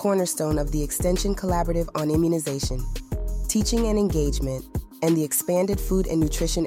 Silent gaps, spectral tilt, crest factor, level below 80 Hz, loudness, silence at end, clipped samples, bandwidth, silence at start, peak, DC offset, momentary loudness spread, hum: none; -5.5 dB/octave; 14 dB; -30 dBFS; -24 LUFS; 0 s; under 0.1%; 16.5 kHz; 0 s; -10 dBFS; under 0.1%; 7 LU; none